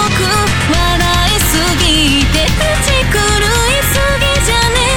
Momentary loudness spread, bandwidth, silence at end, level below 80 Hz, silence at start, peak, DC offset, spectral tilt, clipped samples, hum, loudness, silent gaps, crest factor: 2 LU; 18 kHz; 0 s; -18 dBFS; 0 s; -2 dBFS; 3%; -3.5 dB/octave; under 0.1%; none; -11 LUFS; none; 10 dB